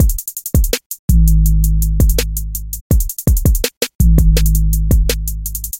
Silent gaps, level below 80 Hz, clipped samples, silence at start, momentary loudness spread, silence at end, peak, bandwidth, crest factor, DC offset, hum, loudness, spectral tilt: 0.86-0.90 s, 0.99-1.08 s, 2.81-2.90 s, 3.77-3.81 s, 3.95-3.99 s; -14 dBFS; under 0.1%; 0 s; 9 LU; 0 s; 0 dBFS; 17 kHz; 12 dB; under 0.1%; none; -16 LUFS; -5 dB/octave